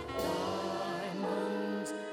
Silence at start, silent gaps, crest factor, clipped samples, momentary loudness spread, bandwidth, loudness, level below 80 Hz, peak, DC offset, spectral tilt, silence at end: 0 s; none; 12 dB; under 0.1%; 2 LU; 16 kHz; -36 LUFS; -62 dBFS; -24 dBFS; under 0.1%; -5 dB/octave; 0 s